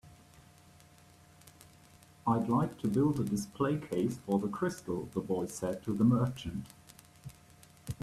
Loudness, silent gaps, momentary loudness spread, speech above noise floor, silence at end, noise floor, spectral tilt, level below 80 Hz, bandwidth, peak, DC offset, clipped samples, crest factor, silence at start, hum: -33 LUFS; none; 22 LU; 28 dB; 0.1 s; -59 dBFS; -7 dB/octave; -62 dBFS; 14.5 kHz; -16 dBFS; under 0.1%; under 0.1%; 18 dB; 0.05 s; none